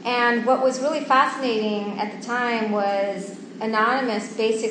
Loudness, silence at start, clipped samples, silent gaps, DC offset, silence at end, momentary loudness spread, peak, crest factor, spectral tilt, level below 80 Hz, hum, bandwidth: -22 LUFS; 0 s; under 0.1%; none; under 0.1%; 0 s; 9 LU; -4 dBFS; 18 dB; -4 dB/octave; -80 dBFS; none; 9.8 kHz